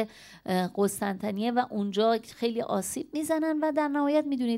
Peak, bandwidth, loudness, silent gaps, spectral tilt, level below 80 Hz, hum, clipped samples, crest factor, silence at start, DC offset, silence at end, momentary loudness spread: -14 dBFS; 16 kHz; -28 LUFS; none; -5 dB/octave; -68 dBFS; none; under 0.1%; 14 dB; 0 s; under 0.1%; 0 s; 5 LU